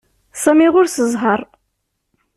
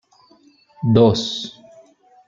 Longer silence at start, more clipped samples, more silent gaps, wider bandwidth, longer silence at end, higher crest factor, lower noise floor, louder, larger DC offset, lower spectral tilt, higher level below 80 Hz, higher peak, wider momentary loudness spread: second, 0.35 s vs 0.8 s; neither; neither; first, 14 kHz vs 7.6 kHz; first, 0.9 s vs 0.75 s; about the same, 14 dB vs 18 dB; first, -71 dBFS vs -54 dBFS; first, -15 LUFS vs -18 LUFS; neither; second, -4 dB/octave vs -7 dB/octave; about the same, -58 dBFS vs -54 dBFS; about the same, -2 dBFS vs -2 dBFS; second, 9 LU vs 15 LU